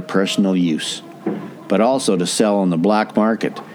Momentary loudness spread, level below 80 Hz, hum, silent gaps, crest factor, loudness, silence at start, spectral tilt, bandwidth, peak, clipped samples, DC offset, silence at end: 10 LU; -70 dBFS; none; none; 16 dB; -18 LUFS; 0 s; -5 dB/octave; 17 kHz; -2 dBFS; under 0.1%; under 0.1%; 0 s